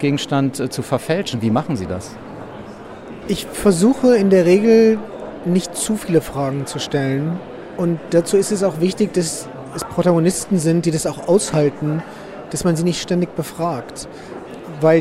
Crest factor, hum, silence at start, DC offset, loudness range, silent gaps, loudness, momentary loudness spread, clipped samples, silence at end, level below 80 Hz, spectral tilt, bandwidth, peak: 16 dB; none; 0 s; under 0.1%; 6 LU; none; -18 LUFS; 20 LU; under 0.1%; 0 s; -48 dBFS; -5.5 dB/octave; 16 kHz; -2 dBFS